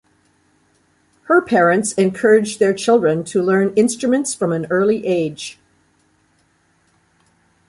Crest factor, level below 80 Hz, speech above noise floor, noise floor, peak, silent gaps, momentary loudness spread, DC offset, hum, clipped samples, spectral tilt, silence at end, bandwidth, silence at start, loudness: 16 dB; -60 dBFS; 44 dB; -60 dBFS; -2 dBFS; none; 6 LU; under 0.1%; none; under 0.1%; -5 dB/octave; 2.15 s; 11.5 kHz; 1.3 s; -16 LUFS